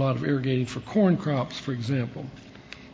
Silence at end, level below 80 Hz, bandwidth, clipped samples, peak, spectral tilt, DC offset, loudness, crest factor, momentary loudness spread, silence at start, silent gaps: 0 s; -58 dBFS; 8 kHz; under 0.1%; -10 dBFS; -7.5 dB/octave; under 0.1%; -26 LUFS; 16 dB; 20 LU; 0 s; none